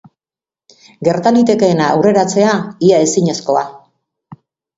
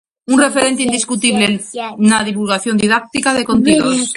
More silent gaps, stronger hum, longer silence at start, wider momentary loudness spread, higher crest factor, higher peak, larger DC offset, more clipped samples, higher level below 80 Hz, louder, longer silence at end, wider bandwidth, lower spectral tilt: neither; neither; first, 1 s vs 0.3 s; about the same, 6 LU vs 4 LU; about the same, 14 dB vs 14 dB; about the same, 0 dBFS vs 0 dBFS; neither; neither; second, -56 dBFS vs -48 dBFS; about the same, -13 LUFS vs -14 LUFS; first, 0.45 s vs 0 s; second, 8 kHz vs 11.5 kHz; first, -5.5 dB/octave vs -3.5 dB/octave